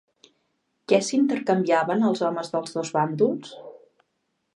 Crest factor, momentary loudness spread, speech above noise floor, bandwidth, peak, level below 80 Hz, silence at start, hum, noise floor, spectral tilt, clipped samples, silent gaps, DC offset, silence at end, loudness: 20 dB; 13 LU; 53 dB; 11 kHz; -6 dBFS; -78 dBFS; 0.9 s; none; -75 dBFS; -5.5 dB/octave; under 0.1%; none; under 0.1%; 0.8 s; -23 LUFS